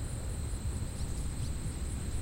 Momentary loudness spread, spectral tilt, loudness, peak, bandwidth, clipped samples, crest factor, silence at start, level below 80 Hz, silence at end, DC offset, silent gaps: 1 LU; -5 dB/octave; -38 LUFS; -22 dBFS; 16 kHz; under 0.1%; 12 dB; 0 s; -38 dBFS; 0 s; under 0.1%; none